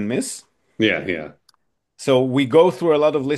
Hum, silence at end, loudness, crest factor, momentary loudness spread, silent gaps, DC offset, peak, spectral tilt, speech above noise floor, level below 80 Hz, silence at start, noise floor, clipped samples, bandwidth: none; 0 s; -19 LUFS; 18 dB; 14 LU; none; under 0.1%; -2 dBFS; -5 dB/octave; 44 dB; -62 dBFS; 0 s; -62 dBFS; under 0.1%; 12.5 kHz